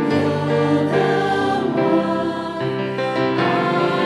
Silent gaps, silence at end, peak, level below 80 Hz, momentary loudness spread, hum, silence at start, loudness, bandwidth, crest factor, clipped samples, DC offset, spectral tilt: none; 0 s; -6 dBFS; -60 dBFS; 5 LU; none; 0 s; -19 LUFS; 12 kHz; 14 dB; under 0.1%; under 0.1%; -7 dB/octave